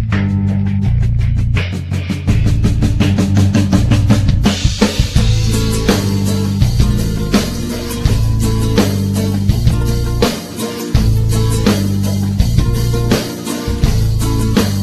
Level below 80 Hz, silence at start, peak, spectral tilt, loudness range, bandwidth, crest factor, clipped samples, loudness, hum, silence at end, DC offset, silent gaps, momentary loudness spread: -20 dBFS; 0 s; 0 dBFS; -6 dB/octave; 2 LU; 14 kHz; 12 dB; under 0.1%; -15 LUFS; none; 0 s; under 0.1%; none; 5 LU